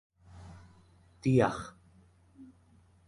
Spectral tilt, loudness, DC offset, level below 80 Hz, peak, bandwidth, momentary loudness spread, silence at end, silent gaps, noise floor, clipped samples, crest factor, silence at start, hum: -7.5 dB/octave; -30 LUFS; under 0.1%; -60 dBFS; -12 dBFS; 11.5 kHz; 26 LU; 0.65 s; none; -63 dBFS; under 0.1%; 24 dB; 0.35 s; none